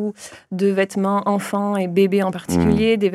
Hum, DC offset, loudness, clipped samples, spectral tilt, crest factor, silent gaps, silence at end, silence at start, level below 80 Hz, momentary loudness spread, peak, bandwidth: none; under 0.1%; -19 LUFS; under 0.1%; -6.5 dB/octave; 14 dB; none; 0 s; 0 s; -44 dBFS; 7 LU; -4 dBFS; 13.5 kHz